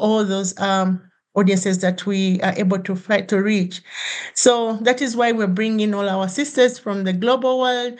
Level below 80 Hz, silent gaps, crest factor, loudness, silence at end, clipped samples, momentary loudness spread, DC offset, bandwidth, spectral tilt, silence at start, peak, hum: -74 dBFS; none; 18 dB; -19 LUFS; 0 s; under 0.1%; 6 LU; under 0.1%; 10 kHz; -4.5 dB/octave; 0 s; -2 dBFS; none